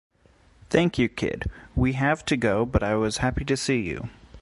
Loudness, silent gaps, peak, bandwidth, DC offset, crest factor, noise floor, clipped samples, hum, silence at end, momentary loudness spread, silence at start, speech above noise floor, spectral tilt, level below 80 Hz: -25 LUFS; none; -6 dBFS; 11.5 kHz; under 0.1%; 20 dB; -58 dBFS; under 0.1%; none; 0 s; 9 LU; 0.7 s; 34 dB; -5.5 dB/octave; -38 dBFS